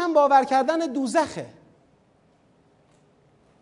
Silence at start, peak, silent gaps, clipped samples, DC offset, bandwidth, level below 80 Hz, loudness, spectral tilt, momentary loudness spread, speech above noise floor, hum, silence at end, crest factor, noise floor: 0 s; -6 dBFS; none; under 0.1%; under 0.1%; 11 kHz; -70 dBFS; -21 LUFS; -4.5 dB/octave; 17 LU; 40 dB; none; 2.15 s; 18 dB; -61 dBFS